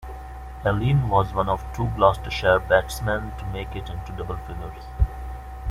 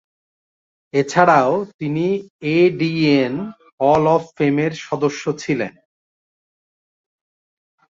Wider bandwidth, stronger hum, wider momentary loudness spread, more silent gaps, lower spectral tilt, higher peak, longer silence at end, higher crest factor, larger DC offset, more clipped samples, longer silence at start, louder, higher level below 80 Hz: first, 15.5 kHz vs 7.8 kHz; neither; first, 16 LU vs 10 LU; second, none vs 1.74-1.79 s, 2.30-2.39 s, 3.73-3.78 s; about the same, -6.5 dB/octave vs -6.5 dB/octave; about the same, -2 dBFS vs -2 dBFS; second, 0 s vs 2.2 s; about the same, 22 dB vs 18 dB; neither; neither; second, 0 s vs 0.95 s; second, -24 LUFS vs -18 LUFS; first, -32 dBFS vs -60 dBFS